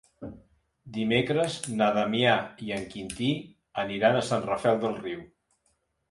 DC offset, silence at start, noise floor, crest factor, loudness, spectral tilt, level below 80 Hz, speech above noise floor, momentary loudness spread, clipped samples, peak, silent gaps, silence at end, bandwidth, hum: under 0.1%; 0.2 s; -73 dBFS; 20 dB; -27 LUFS; -5 dB/octave; -60 dBFS; 46 dB; 14 LU; under 0.1%; -8 dBFS; none; 0.85 s; 11.5 kHz; none